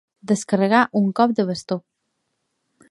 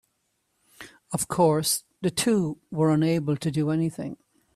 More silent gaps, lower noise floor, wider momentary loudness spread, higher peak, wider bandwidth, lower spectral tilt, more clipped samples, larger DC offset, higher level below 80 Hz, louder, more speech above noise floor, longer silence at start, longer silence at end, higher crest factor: neither; about the same, -74 dBFS vs -74 dBFS; about the same, 11 LU vs 9 LU; first, -2 dBFS vs -8 dBFS; second, 11.5 kHz vs 15.5 kHz; about the same, -5.5 dB/octave vs -5 dB/octave; neither; neither; second, -68 dBFS vs -60 dBFS; first, -20 LUFS vs -25 LUFS; first, 55 dB vs 50 dB; second, 0.25 s vs 0.8 s; first, 1.1 s vs 0.4 s; about the same, 20 dB vs 18 dB